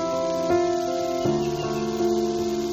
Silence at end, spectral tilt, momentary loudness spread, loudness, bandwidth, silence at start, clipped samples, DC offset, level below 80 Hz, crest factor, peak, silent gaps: 0 s; -5.5 dB/octave; 4 LU; -24 LUFS; 15 kHz; 0 s; under 0.1%; under 0.1%; -50 dBFS; 14 dB; -10 dBFS; none